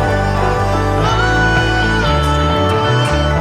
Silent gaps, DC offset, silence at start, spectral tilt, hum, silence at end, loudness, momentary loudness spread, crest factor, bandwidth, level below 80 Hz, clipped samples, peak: none; under 0.1%; 0 s; -5.5 dB/octave; none; 0 s; -14 LUFS; 3 LU; 12 dB; 14 kHz; -22 dBFS; under 0.1%; 0 dBFS